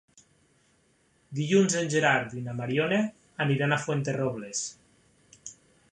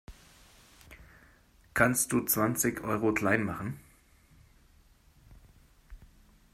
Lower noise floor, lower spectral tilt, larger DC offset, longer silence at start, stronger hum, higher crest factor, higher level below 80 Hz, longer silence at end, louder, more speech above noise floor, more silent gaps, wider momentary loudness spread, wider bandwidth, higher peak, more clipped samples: first, -67 dBFS vs -61 dBFS; about the same, -4.5 dB/octave vs -4.5 dB/octave; neither; first, 1.3 s vs 0.1 s; neither; about the same, 22 dB vs 24 dB; second, -68 dBFS vs -56 dBFS; about the same, 0.4 s vs 0.5 s; about the same, -27 LUFS vs -29 LUFS; first, 40 dB vs 33 dB; neither; first, 15 LU vs 12 LU; second, 11 kHz vs 16 kHz; about the same, -8 dBFS vs -10 dBFS; neither